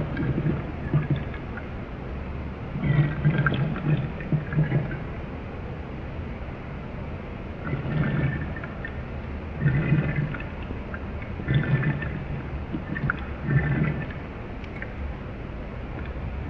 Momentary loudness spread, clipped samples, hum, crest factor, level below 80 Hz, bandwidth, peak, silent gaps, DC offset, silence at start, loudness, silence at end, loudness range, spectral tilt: 12 LU; under 0.1%; none; 20 dB; -38 dBFS; 5.2 kHz; -8 dBFS; none; under 0.1%; 0 s; -29 LUFS; 0 s; 5 LU; -9.5 dB/octave